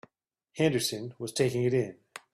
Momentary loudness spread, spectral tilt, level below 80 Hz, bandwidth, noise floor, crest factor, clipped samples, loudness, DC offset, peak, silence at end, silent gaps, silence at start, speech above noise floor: 14 LU; -5 dB/octave; -66 dBFS; 15.5 kHz; -76 dBFS; 18 dB; under 0.1%; -29 LUFS; under 0.1%; -12 dBFS; 0.15 s; none; 0.55 s; 48 dB